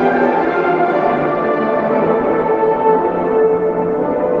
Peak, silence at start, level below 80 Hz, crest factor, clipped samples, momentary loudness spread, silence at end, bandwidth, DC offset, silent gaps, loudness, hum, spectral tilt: -2 dBFS; 0 s; -48 dBFS; 12 dB; under 0.1%; 3 LU; 0 s; 5.2 kHz; under 0.1%; none; -15 LUFS; none; -9 dB/octave